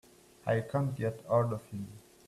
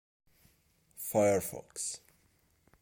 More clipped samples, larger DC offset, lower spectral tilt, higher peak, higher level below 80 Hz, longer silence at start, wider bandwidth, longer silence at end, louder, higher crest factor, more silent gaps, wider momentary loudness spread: neither; neither; first, -8 dB/octave vs -4.5 dB/octave; first, -14 dBFS vs -18 dBFS; about the same, -66 dBFS vs -70 dBFS; second, 0.45 s vs 1 s; second, 14 kHz vs 17 kHz; second, 0.25 s vs 0.85 s; about the same, -33 LUFS vs -33 LUFS; about the same, 20 dB vs 20 dB; neither; about the same, 13 LU vs 14 LU